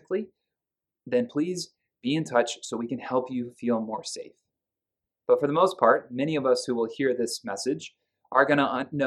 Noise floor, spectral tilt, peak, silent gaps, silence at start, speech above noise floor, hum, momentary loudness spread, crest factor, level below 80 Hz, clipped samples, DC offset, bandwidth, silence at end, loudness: -90 dBFS; -4.5 dB/octave; -4 dBFS; none; 0.1 s; 64 dB; none; 13 LU; 22 dB; -76 dBFS; under 0.1%; under 0.1%; 13 kHz; 0 s; -26 LUFS